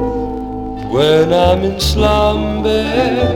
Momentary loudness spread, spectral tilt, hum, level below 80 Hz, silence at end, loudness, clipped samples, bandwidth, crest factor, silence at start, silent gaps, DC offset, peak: 11 LU; -5.5 dB/octave; none; -24 dBFS; 0 s; -14 LUFS; under 0.1%; 18.5 kHz; 12 dB; 0 s; none; 0.2%; 0 dBFS